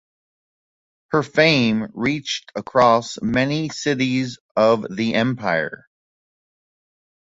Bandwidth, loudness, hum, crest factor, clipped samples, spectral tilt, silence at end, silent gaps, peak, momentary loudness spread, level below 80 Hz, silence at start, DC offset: 8 kHz; -20 LUFS; none; 20 dB; under 0.1%; -5 dB/octave; 1.55 s; 4.40-4.55 s; -2 dBFS; 9 LU; -56 dBFS; 1.1 s; under 0.1%